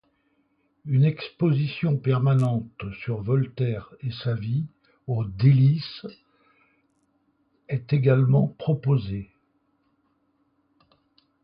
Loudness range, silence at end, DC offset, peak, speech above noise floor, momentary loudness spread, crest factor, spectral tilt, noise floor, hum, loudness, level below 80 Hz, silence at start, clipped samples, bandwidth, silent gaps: 2 LU; 2.2 s; under 0.1%; -6 dBFS; 46 dB; 16 LU; 18 dB; -10 dB/octave; -69 dBFS; none; -24 LUFS; -56 dBFS; 0.85 s; under 0.1%; 5.4 kHz; none